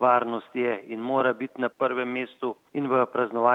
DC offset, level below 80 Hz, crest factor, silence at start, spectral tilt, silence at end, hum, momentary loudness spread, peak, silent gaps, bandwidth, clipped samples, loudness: under 0.1%; -82 dBFS; 18 dB; 0 s; -7.5 dB/octave; 0 s; none; 8 LU; -6 dBFS; none; 5.2 kHz; under 0.1%; -27 LUFS